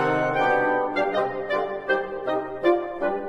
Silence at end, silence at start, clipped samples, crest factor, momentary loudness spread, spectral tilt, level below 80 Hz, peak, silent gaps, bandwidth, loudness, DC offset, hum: 0 s; 0 s; under 0.1%; 16 dB; 6 LU; -6.5 dB/octave; -56 dBFS; -8 dBFS; none; 9.8 kHz; -24 LUFS; under 0.1%; none